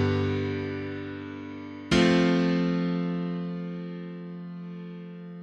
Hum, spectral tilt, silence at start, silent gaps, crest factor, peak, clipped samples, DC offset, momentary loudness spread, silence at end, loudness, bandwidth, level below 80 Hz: none; -6.5 dB/octave; 0 s; none; 20 dB; -8 dBFS; under 0.1%; under 0.1%; 17 LU; 0 s; -27 LUFS; 9.4 kHz; -54 dBFS